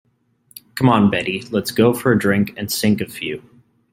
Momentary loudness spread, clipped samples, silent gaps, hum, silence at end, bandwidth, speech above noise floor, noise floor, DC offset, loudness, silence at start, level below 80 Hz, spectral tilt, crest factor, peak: 12 LU; under 0.1%; none; none; 0.55 s; 16.5 kHz; 40 dB; -57 dBFS; under 0.1%; -18 LUFS; 0.75 s; -54 dBFS; -5.5 dB/octave; 18 dB; -2 dBFS